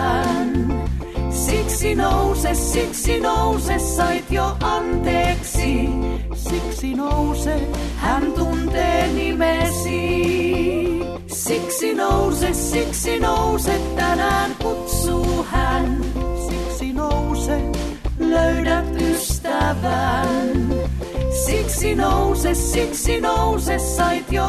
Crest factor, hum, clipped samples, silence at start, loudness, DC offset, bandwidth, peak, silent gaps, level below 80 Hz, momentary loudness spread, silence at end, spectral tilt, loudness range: 14 dB; none; under 0.1%; 0 s; -20 LUFS; under 0.1%; 14 kHz; -6 dBFS; none; -26 dBFS; 6 LU; 0 s; -5 dB/octave; 2 LU